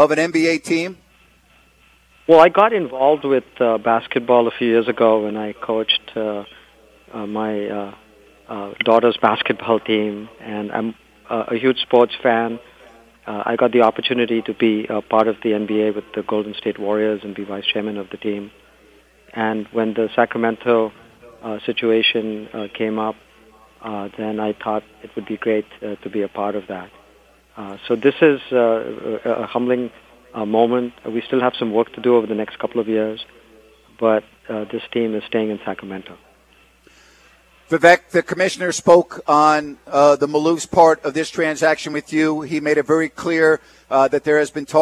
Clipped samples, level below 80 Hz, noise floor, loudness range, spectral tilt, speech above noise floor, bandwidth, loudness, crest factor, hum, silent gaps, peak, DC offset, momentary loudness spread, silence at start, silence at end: under 0.1%; -60 dBFS; -54 dBFS; 8 LU; -4.5 dB/octave; 35 dB; 12.5 kHz; -18 LUFS; 18 dB; none; none; 0 dBFS; under 0.1%; 15 LU; 0 s; 0 s